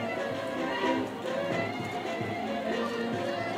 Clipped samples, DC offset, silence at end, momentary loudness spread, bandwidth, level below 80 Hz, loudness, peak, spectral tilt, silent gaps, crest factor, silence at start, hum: under 0.1%; under 0.1%; 0 s; 4 LU; 16 kHz; -66 dBFS; -32 LUFS; -16 dBFS; -5.5 dB/octave; none; 16 dB; 0 s; none